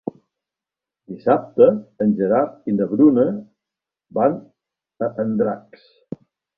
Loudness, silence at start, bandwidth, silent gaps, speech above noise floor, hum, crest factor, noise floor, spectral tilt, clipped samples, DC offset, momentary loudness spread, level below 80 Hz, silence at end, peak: -19 LUFS; 0.05 s; 4.9 kHz; none; 70 dB; none; 20 dB; -88 dBFS; -11.5 dB/octave; under 0.1%; under 0.1%; 21 LU; -64 dBFS; 1 s; 0 dBFS